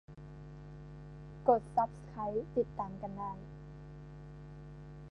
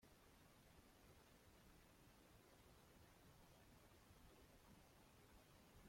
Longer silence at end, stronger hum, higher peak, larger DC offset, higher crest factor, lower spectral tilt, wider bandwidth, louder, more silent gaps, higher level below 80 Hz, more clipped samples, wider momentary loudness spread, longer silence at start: about the same, 0 s vs 0 s; neither; first, -14 dBFS vs -56 dBFS; neither; first, 24 dB vs 14 dB; first, -9 dB/octave vs -4 dB/octave; second, 10 kHz vs 16.5 kHz; first, -36 LUFS vs -70 LUFS; neither; first, -56 dBFS vs -76 dBFS; neither; first, 20 LU vs 0 LU; about the same, 0.1 s vs 0 s